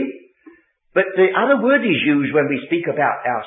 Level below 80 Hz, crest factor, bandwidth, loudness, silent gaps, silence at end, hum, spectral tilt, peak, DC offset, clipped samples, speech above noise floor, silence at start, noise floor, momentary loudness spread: -68 dBFS; 16 dB; 3.9 kHz; -17 LUFS; none; 0 s; none; -11 dB/octave; -2 dBFS; under 0.1%; under 0.1%; 32 dB; 0 s; -49 dBFS; 6 LU